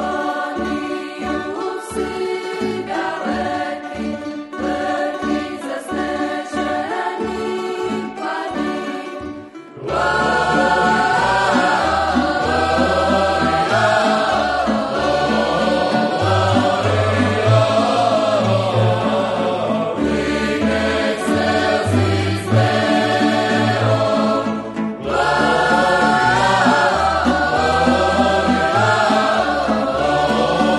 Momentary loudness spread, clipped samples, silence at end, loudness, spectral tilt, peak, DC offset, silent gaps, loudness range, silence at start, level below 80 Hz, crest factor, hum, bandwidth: 9 LU; under 0.1%; 0 s; -17 LUFS; -5.5 dB/octave; -2 dBFS; under 0.1%; none; 8 LU; 0 s; -40 dBFS; 16 dB; none; 11.5 kHz